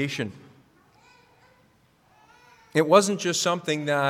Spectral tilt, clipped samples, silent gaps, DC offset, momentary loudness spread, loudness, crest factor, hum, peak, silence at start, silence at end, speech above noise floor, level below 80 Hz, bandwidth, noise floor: -4 dB/octave; under 0.1%; none; under 0.1%; 12 LU; -23 LUFS; 24 dB; none; -2 dBFS; 0 s; 0 s; 39 dB; -74 dBFS; 16.5 kHz; -61 dBFS